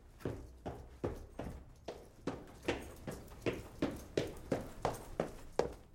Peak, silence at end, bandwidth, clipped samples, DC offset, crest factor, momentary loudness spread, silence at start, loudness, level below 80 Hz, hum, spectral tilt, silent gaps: -18 dBFS; 0 s; 16.5 kHz; under 0.1%; under 0.1%; 24 dB; 9 LU; 0 s; -43 LUFS; -54 dBFS; none; -6 dB/octave; none